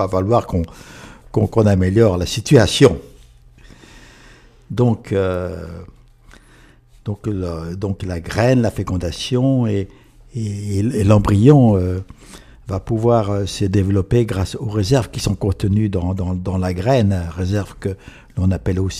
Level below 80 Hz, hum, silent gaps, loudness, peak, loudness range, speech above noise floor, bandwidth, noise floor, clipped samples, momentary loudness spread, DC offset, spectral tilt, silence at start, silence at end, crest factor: -38 dBFS; none; none; -18 LUFS; 0 dBFS; 8 LU; 31 dB; 14 kHz; -48 dBFS; under 0.1%; 14 LU; under 0.1%; -7 dB/octave; 0 s; 0 s; 18 dB